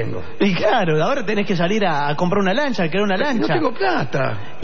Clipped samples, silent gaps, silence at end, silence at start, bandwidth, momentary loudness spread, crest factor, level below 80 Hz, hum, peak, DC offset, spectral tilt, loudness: under 0.1%; none; 0 s; 0 s; 7.2 kHz; 4 LU; 14 dB; -54 dBFS; none; -6 dBFS; 7%; -6 dB/octave; -19 LUFS